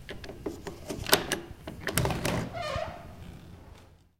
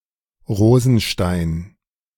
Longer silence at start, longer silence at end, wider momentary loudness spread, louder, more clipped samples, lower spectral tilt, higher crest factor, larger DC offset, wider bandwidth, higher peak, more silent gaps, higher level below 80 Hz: second, 0 s vs 0.5 s; second, 0.25 s vs 0.5 s; first, 21 LU vs 12 LU; second, -31 LUFS vs -17 LUFS; neither; second, -3.5 dB/octave vs -6.5 dB/octave; first, 32 dB vs 16 dB; neither; about the same, 17 kHz vs 17.5 kHz; about the same, -2 dBFS vs -2 dBFS; neither; second, -48 dBFS vs -38 dBFS